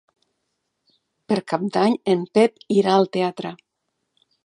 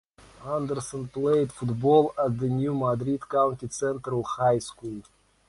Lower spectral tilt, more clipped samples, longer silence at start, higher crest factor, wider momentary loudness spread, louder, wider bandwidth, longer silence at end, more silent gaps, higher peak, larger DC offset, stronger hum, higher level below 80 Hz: about the same, -6.5 dB/octave vs -7 dB/octave; neither; first, 1.3 s vs 0.4 s; about the same, 20 dB vs 18 dB; second, 8 LU vs 13 LU; first, -20 LUFS vs -26 LUFS; about the same, 11 kHz vs 11.5 kHz; first, 0.9 s vs 0.45 s; neither; first, -2 dBFS vs -8 dBFS; neither; neither; second, -72 dBFS vs -58 dBFS